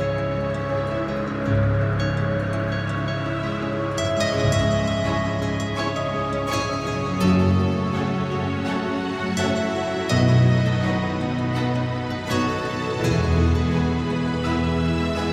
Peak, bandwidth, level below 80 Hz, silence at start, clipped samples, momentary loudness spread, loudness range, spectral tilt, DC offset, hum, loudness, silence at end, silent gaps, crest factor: -6 dBFS; 14 kHz; -36 dBFS; 0 s; under 0.1%; 6 LU; 2 LU; -6.5 dB/octave; under 0.1%; none; -23 LUFS; 0 s; none; 16 dB